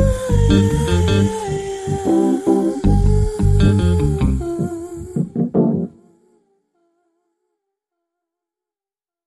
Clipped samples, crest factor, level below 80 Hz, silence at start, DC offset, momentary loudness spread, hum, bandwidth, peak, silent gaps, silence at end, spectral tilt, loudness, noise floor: under 0.1%; 16 dB; -26 dBFS; 0 s; under 0.1%; 9 LU; none; 12.5 kHz; -2 dBFS; none; 3.35 s; -7.5 dB/octave; -17 LUFS; under -90 dBFS